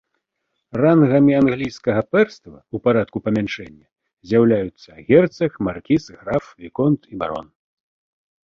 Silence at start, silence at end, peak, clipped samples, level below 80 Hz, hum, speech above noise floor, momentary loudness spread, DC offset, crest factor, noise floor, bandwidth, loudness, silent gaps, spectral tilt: 0.75 s; 1 s; -2 dBFS; under 0.1%; -52 dBFS; none; 57 dB; 15 LU; under 0.1%; 18 dB; -76 dBFS; 7 kHz; -19 LUFS; 3.92-3.96 s, 4.13-4.17 s; -8 dB/octave